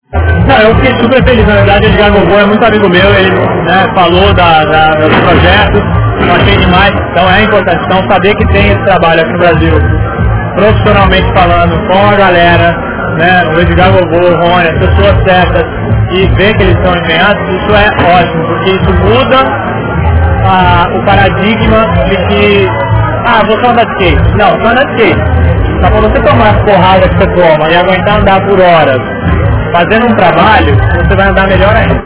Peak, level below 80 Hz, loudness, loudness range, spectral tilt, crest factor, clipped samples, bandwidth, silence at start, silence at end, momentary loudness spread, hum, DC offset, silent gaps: 0 dBFS; -16 dBFS; -6 LUFS; 2 LU; -10 dB/octave; 6 dB; 8%; 4 kHz; 0.1 s; 0 s; 4 LU; none; 1%; none